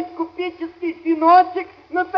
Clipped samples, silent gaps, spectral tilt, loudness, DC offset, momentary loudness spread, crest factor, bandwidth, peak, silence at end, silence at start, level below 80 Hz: under 0.1%; none; -6.5 dB/octave; -19 LUFS; under 0.1%; 14 LU; 16 dB; 5.8 kHz; -2 dBFS; 0 s; 0 s; -64 dBFS